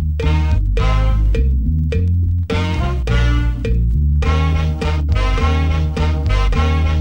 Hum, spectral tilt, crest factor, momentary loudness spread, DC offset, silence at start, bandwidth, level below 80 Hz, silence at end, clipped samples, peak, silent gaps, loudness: none; -7 dB/octave; 12 dB; 3 LU; under 0.1%; 0 s; 8.4 kHz; -18 dBFS; 0 s; under 0.1%; -4 dBFS; none; -17 LUFS